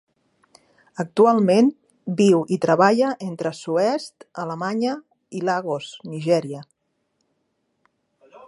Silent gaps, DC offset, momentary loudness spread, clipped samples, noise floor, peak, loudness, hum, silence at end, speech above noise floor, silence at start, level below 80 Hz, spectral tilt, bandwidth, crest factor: none; under 0.1%; 18 LU; under 0.1%; -72 dBFS; -2 dBFS; -21 LUFS; none; 1.85 s; 52 dB; 1 s; -74 dBFS; -6.5 dB/octave; 11.5 kHz; 20 dB